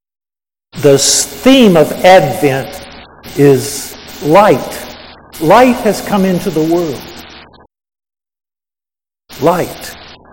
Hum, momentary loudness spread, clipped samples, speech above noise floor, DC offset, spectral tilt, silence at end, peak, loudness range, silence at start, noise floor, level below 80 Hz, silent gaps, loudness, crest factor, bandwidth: none; 19 LU; 1%; over 81 dB; under 0.1%; -4.5 dB/octave; 0.3 s; 0 dBFS; 11 LU; 0.75 s; under -90 dBFS; -42 dBFS; none; -10 LUFS; 12 dB; 18 kHz